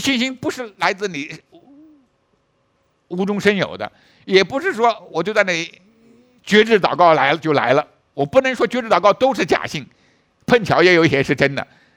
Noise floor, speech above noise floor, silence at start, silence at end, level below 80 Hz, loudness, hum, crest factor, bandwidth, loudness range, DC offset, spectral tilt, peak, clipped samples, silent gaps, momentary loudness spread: -64 dBFS; 47 dB; 0 s; 0.3 s; -56 dBFS; -17 LUFS; none; 18 dB; 16 kHz; 8 LU; under 0.1%; -5 dB/octave; 0 dBFS; under 0.1%; none; 16 LU